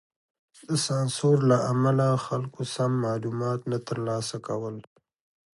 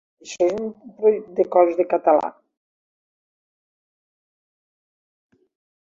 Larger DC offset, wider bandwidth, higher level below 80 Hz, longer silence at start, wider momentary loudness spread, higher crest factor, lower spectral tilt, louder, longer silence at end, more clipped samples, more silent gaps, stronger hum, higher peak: neither; first, 11.5 kHz vs 7.6 kHz; about the same, -66 dBFS vs -70 dBFS; first, 0.7 s vs 0.25 s; second, 10 LU vs 14 LU; about the same, 18 dB vs 20 dB; about the same, -6 dB/octave vs -5.5 dB/octave; second, -26 LUFS vs -20 LUFS; second, 0.75 s vs 3.65 s; neither; neither; neither; second, -10 dBFS vs -4 dBFS